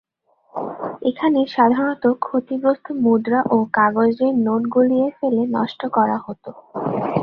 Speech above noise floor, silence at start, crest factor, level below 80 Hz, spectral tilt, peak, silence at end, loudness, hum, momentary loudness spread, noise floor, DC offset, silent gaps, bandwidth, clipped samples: 41 dB; 0.55 s; 16 dB; -62 dBFS; -9 dB/octave; -2 dBFS; 0 s; -19 LUFS; none; 12 LU; -59 dBFS; under 0.1%; none; 5.4 kHz; under 0.1%